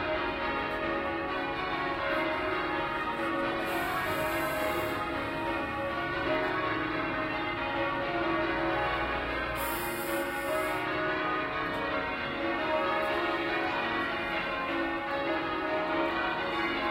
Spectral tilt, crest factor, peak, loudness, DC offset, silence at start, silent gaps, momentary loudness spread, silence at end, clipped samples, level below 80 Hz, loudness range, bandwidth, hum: -4.5 dB/octave; 14 dB; -16 dBFS; -31 LUFS; under 0.1%; 0 s; none; 3 LU; 0 s; under 0.1%; -52 dBFS; 1 LU; 16 kHz; none